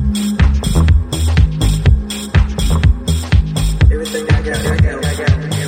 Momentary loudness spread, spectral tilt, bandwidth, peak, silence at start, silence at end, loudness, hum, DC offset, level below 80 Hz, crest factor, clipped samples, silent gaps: 4 LU; -5.5 dB/octave; 16.5 kHz; 0 dBFS; 0 s; 0 s; -15 LUFS; none; under 0.1%; -16 dBFS; 12 dB; under 0.1%; none